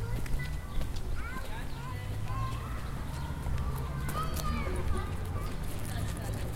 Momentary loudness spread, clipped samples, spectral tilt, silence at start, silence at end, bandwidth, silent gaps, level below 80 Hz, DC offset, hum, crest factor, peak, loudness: 5 LU; under 0.1%; -5.5 dB/octave; 0 s; 0 s; 16.5 kHz; none; -36 dBFS; under 0.1%; none; 16 dB; -18 dBFS; -37 LUFS